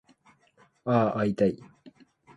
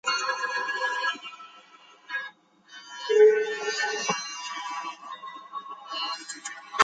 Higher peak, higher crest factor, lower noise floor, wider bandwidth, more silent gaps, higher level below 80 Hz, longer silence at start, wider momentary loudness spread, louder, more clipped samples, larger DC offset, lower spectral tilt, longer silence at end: second, -10 dBFS vs -4 dBFS; about the same, 20 dB vs 24 dB; first, -63 dBFS vs -54 dBFS; about the same, 8.6 kHz vs 9.4 kHz; neither; first, -62 dBFS vs under -90 dBFS; first, 0.85 s vs 0.05 s; second, 13 LU vs 22 LU; about the same, -27 LUFS vs -27 LUFS; neither; neither; first, -8.5 dB/octave vs -1 dB/octave; first, 0.5 s vs 0 s